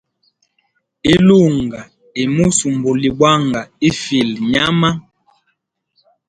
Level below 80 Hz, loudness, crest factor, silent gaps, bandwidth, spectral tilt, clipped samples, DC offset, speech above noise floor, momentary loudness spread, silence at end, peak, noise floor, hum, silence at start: -44 dBFS; -14 LUFS; 16 dB; none; 11 kHz; -5 dB/octave; under 0.1%; under 0.1%; 54 dB; 11 LU; 1.3 s; 0 dBFS; -68 dBFS; none; 1.05 s